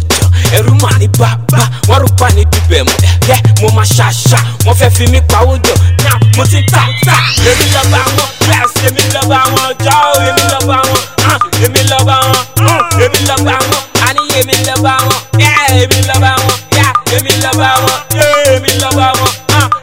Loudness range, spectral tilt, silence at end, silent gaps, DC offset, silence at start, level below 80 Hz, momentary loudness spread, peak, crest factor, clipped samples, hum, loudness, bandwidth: 1 LU; -4 dB/octave; 0 s; none; 2%; 0 s; -22 dBFS; 3 LU; 0 dBFS; 8 dB; 2%; none; -8 LUFS; 20 kHz